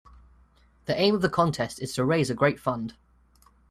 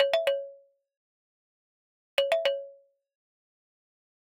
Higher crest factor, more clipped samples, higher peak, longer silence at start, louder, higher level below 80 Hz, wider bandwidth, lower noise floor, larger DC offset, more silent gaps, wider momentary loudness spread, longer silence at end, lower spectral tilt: about the same, 20 dB vs 24 dB; neither; about the same, -8 dBFS vs -8 dBFS; first, 0.9 s vs 0 s; first, -25 LUFS vs -29 LUFS; first, -56 dBFS vs -84 dBFS; second, 14.5 kHz vs 16.5 kHz; first, -60 dBFS vs -54 dBFS; neither; second, none vs 0.97-2.17 s; second, 10 LU vs 17 LU; second, 0.8 s vs 1.65 s; first, -5.5 dB/octave vs 0 dB/octave